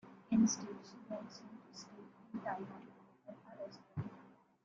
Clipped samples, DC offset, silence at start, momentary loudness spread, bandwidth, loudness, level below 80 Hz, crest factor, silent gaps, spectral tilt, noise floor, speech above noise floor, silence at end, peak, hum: under 0.1%; under 0.1%; 0.05 s; 24 LU; 7.6 kHz; -40 LUFS; -78 dBFS; 22 dB; none; -5 dB/octave; -63 dBFS; 19 dB; 0.3 s; -22 dBFS; none